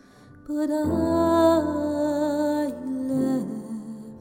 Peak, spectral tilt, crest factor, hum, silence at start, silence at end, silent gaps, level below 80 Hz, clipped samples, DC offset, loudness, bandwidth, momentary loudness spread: -8 dBFS; -6.5 dB/octave; 16 dB; none; 0.35 s; 0 s; none; -52 dBFS; under 0.1%; under 0.1%; -24 LUFS; 17 kHz; 14 LU